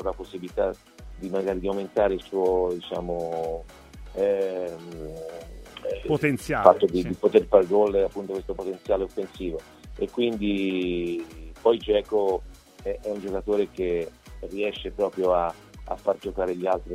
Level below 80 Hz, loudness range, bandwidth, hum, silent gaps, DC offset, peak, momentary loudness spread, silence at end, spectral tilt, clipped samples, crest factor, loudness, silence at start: -46 dBFS; 6 LU; 15 kHz; none; none; under 0.1%; 0 dBFS; 16 LU; 0 s; -6.5 dB/octave; under 0.1%; 26 dB; -26 LUFS; 0 s